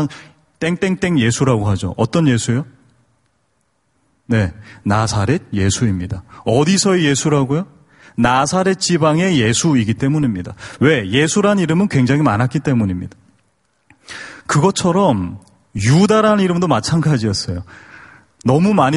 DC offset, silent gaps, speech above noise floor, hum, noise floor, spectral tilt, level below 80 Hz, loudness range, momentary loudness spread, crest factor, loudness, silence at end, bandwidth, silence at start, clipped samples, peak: under 0.1%; none; 49 dB; none; -65 dBFS; -5.5 dB/octave; -44 dBFS; 5 LU; 13 LU; 16 dB; -16 LUFS; 0 s; 11.5 kHz; 0 s; under 0.1%; 0 dBFS